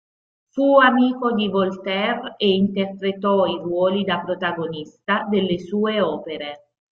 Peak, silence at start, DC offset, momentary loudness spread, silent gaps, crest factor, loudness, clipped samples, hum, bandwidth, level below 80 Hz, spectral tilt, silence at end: -2 dBFS; 0.55 s; under 0.1%; 12 LU; none; 18 dB; -20 LUFS; under 0.1%; none; 6.8 kHz; -62 dBFS; -7.5 dB/octave; 0.4 s